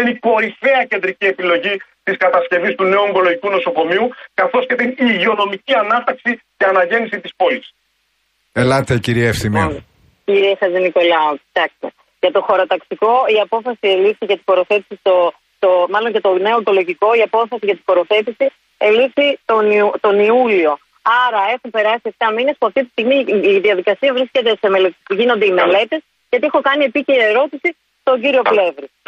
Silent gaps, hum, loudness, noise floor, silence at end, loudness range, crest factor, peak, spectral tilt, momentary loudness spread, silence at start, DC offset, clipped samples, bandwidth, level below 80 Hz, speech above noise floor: none; none; -15 LUFS; -64 dBFS; 0.2 s; 3 LU; 14 dB; -2 dBFS; -5.5 dB/octave; 6 LU; 0 s; under 0.1%; under 0.1%; 13.5 kHz; -50 dBFS; 50 dB